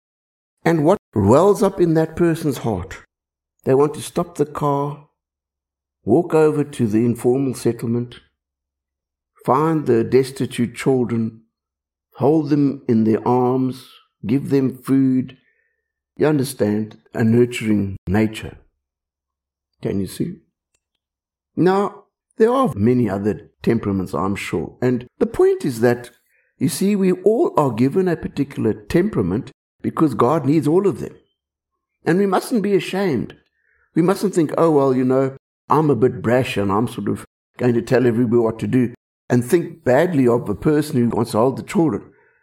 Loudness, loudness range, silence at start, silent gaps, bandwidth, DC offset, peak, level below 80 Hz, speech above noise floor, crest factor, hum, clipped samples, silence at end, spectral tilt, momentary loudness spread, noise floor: -19 LUFS; 4 LU; 0.65 s; 0.99-1.12 s, 17.98-18.07 s, 29.54-29.79 s, 35.39-35.68 s, 37.27-37.54 s, 38.97-39.28 s; 16.5 kHz; under 0.1%; -2 dBFS; -52 dBFS; 70 dB; 18 dB; none; under 0.1%; 0.4 s; -7 dB/octave; 9 LU; -88 dBFS